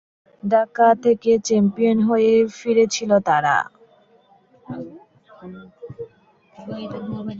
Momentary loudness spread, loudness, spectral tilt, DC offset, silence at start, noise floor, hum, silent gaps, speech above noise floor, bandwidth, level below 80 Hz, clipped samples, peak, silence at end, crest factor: 23 LU; -18 LUFS; -5.5 dB/octave; under 0.1%; 0.45 s; -56 dBFS; none; none; 37 dB; 7.8 kHz; -60 dBFS; under 0.1%; -4 dBFS; 0 s; 18 dB